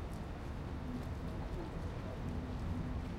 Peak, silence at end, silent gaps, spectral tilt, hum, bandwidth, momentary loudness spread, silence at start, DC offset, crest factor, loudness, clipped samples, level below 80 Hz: -28 dBFS; 0 s; none; -7.5 dB/octave; none; 15 kHz; 4 LU; 0 s; under 0.1%; 12 dB; -43 LUFS; under 0.1%; -46 dBFS